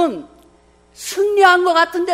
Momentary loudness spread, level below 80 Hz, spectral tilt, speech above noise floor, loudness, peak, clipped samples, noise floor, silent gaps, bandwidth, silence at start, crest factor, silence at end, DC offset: 18 LU; -56 dBFS; -2 dB/octave; 36 dB; -14 LUFS; 0 dBFS; under 0.1%; -51 dBFS; none; 16 kHz; 0 s; 16 dB; 0 s; under 0.1%